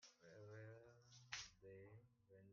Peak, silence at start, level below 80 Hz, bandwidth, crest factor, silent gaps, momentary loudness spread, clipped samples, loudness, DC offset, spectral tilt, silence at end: -32 dBFS; 0 s; -84 dBFS; 7.2 kHz; 30 dB; none; 13 LU; under 0.1%; -59 LUFS; under 0.1%; -2.5 dB/octave; 0 s